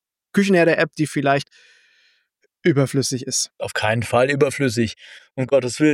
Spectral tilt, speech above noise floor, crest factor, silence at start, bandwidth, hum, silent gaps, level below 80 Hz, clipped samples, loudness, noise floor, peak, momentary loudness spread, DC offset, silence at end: -5 dB/octave; 48 dB; 16 dB; 0.35 s; 16.5 kHz; none; none; -60 dBFS; under 0.1%; -20 LUFS; -67 dBFS; -4 dBFS; 9 LU; under 0.1%; 0 s